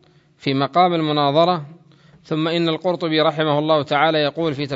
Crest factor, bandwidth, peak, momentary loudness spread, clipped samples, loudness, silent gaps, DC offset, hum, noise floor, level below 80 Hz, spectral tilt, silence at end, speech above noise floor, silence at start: 18 dB; 7.8 kHz; -2 dBFS; 7 LU; under 0.1%; -19 LUFS; none; under 0.1%; none; -50 dBFS; -66 dBFS; -7 dB/octave; 0 s; 32 dB; 0.45 s